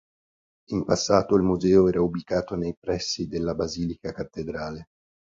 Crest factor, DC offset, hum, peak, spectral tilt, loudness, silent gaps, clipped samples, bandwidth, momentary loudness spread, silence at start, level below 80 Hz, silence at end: 20 dB; under 0.1%; none; -6 dBFS; -5.5 dB/octave; -25 LUFS; 2.77-2.82 s; under 0.1%; 7.8 kHz; 14 LU; 0.7 s; -48 dBFS; 0.4 s